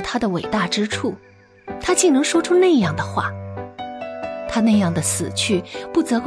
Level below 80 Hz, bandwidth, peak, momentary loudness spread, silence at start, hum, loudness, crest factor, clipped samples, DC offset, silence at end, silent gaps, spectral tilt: -50 dBFS; 11 kHz; -4 dBFS; 16 LU; 0 s; none; -19 LUFS; 16 dB; under 0.1%; under 0.1%; 0 s; none; -4.5 dB/octave